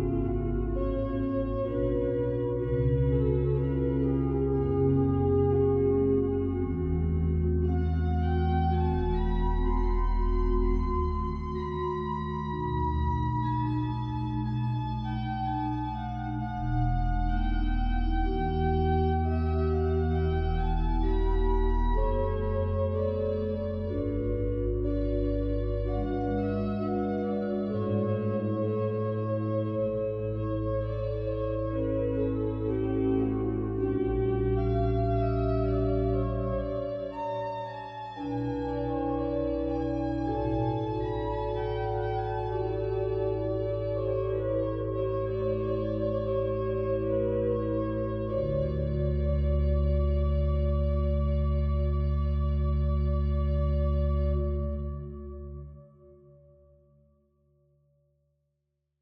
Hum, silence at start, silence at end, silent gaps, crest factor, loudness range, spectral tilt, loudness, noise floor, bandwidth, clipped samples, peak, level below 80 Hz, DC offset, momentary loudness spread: none; 0 s; 2.95 s; none; 14 dB; 4 LU; -10.5 dB/octave; -29 LUFS; -80 dBFS; 5.6 kHz; under 0.1%; -14 dBFS; -34 dBFS; under 0.1%; 5 LU